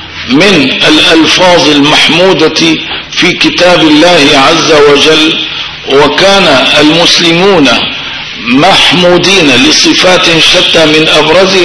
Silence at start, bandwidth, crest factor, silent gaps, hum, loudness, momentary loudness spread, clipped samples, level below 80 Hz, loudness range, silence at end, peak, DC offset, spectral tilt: 0 s; 11 kHz; 4 dB; none; none; -3 LUFS; 6 LU; 10%; -36 dBFS; 1 LU; 0 s; 0 dBFS; 3%; -3 dB/octave